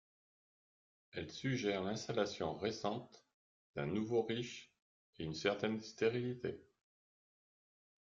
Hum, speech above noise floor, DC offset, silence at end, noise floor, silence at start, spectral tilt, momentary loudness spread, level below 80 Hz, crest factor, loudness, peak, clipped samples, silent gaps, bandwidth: none; over 50 dB; under 0.1%; 1.4 s; under -90 dBFS; 1.15 s; -5.5 dB/octave; 11 LU; -74 dBFS; 20 dB; -40 LUFS; -22 dBFS; under 0.1%; 3.34-3.74 s, 4.82-5.13 s; 7.6 kHz